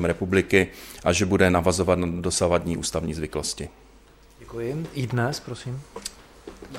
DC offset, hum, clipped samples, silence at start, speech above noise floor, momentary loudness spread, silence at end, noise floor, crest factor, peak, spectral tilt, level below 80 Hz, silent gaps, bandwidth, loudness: under 0.1%; none; under 0.1%; 0 s; 28 dB; 17 LU; 0 s; -52 dBFS; 22 dB; -4 dBFS; -5 dB/octave; -44 dBFS; none; 16 kHz; -24 LUFS